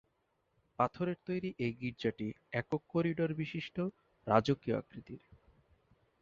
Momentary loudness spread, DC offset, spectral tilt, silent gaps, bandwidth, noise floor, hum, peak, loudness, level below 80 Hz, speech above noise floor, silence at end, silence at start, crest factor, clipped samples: 14 LU; under 0.1%; -6 dB/octave; none; 7.4 kHz; -79 dBFS; none; -12 dBFS; -36 LUFS; -66 dBFS; 43 dB; 1.05 s; 0.8 s; 24 dB; under 0.1%